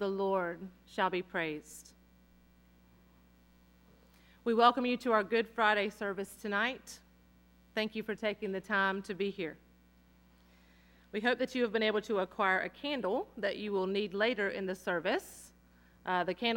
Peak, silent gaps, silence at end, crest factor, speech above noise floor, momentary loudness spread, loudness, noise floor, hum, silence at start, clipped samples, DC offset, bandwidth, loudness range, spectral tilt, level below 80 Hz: -10 dBFS; none; 0 s; 24 dB; 30 dB; 13 LU; -33 LUFS; -64 dBFS; 60 Hz at -65 dBFS; 0 s; under 0.1%; under 0.1%; 17 kHz; 7 LU; -4.5 dB/octave; -68 dBFS